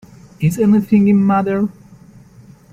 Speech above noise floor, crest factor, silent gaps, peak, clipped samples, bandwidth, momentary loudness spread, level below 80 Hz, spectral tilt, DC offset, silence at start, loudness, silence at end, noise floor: 30 dB; 14 dB; none; -2 dBFS; under 0.1%; 14 kHz; 8 LU; -50 dBFS; -8.5 dB/octave; under 0.1%; 0.4 s; -15 LUFS; 1 s; -43 dBFS